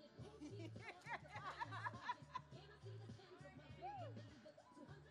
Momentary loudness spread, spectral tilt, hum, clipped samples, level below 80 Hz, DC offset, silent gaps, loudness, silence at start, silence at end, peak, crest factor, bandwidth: 12 LU; -5.5 dB/octave; none; under 0.1%; -76 dBFS; under 0.1%; none; -54 LUFS; 0 s; 0 s; -34 dBFS; 20 dB; 11 kHz